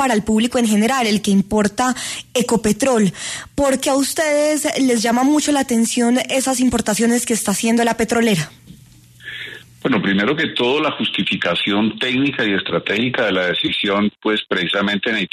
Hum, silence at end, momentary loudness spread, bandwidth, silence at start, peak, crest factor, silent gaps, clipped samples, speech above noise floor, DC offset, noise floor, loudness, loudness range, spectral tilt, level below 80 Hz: none; 0.05 s; 5 LU; 13.5 kHz; 0 s; -2 dBFS; 14 dB; none; under 0.1%; 28 dB; under 0.1%; -45 dBFS; -17 LUFS; 3 LU; -3.5 dB/octave; -48 dBFS